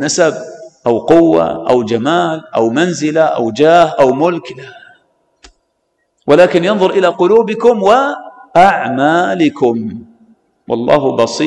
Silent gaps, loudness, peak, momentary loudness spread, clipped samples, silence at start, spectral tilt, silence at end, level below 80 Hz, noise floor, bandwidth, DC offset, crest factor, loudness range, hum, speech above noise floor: none; -11 LUFS; 0 dBFS; 12 LU; under 0.1%; 0 s; -5 dB/octave; 0 s; -50 dBFS; -65 dBFS; 11 kHz; under 0.1%; 12 dB; 3 LU; none; 54 dB